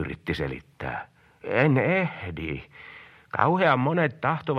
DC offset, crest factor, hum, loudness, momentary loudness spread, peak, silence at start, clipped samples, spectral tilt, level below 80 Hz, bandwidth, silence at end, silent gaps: under 0.1%; 22 dB; none; -25 LUFS; 16 LU; -4 dBFS; 0 s; under 0.1%; -8.5 dB/octave; -50 dBFS; 9.8 kHz; 0 s; none